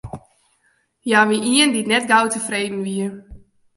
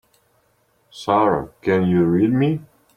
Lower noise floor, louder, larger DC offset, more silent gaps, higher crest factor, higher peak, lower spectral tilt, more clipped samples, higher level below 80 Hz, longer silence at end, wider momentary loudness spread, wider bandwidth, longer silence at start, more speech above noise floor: about the same, -64 dBFS vs -63 dBFS; about the same, -18 LUFS vs -19 LUFS; neither; neither; about the same, 20 dB vs 16 dB; about the same, -2 dBFS vs -4 dBFS; second, -3 dB/octave vs -8.5 dB/octave; neither; about the same, -52 dBFS vs -54 dBFS; about the same, 0.4 s vs 0.35 s; first, 15 LU vs 7 LU; first, 11.5 kHz vs 10 kHz; second, 0.05 s vs 0.95 s; about the same, 46 dB vs 45 dB